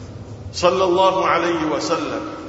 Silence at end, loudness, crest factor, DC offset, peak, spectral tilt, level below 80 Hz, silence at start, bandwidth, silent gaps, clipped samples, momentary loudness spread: 0 s; -18 LUFS; 18 dB; under 0.1%; -2 dBFS; -4.5 dB/octave; -48 dBFS; 0 s; 8 kHz; none; under 0.1%; 14 LU